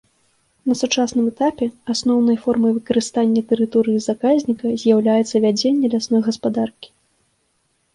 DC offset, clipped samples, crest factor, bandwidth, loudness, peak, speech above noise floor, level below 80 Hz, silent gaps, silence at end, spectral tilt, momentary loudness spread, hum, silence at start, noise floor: under 0.1%; under 0.1%; 14 dB; 11 kHz; -18 LUFS; -4 dBFS; 49 dB; -60 dBFS; none; 1.1 s; -5 dB/octave; 5 LU; none; 0.65 s; -66 dBFS